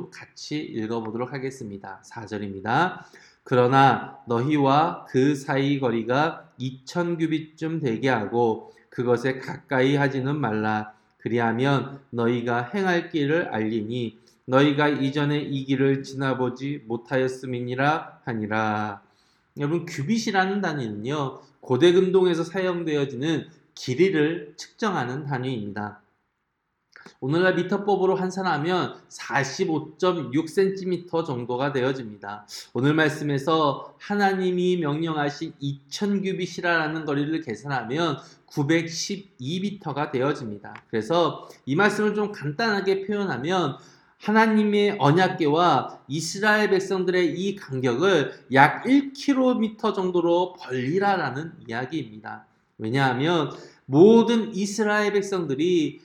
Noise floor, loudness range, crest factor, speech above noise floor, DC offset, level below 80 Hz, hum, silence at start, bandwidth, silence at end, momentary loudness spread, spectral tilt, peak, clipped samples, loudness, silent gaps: -76 dBFS; 5 LU; 24 dB; 53 dB; under 0.1%; -70 dBFS; none; 0 s; 13 kHz; 0.05 s; 13 LU; -6 dB/octave; 0 dBFS; under 0.1%; -24 LUFS; none